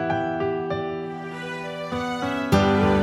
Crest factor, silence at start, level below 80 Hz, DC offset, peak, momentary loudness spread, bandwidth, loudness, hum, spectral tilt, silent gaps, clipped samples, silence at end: 18 dB; 0 s; -44 dBFS; under 0.1%; -6 dBFS; 12 LU; 15 kHz; -25 LUFS; none; -6.5 dB/octave; none; under 0.1%; 0 s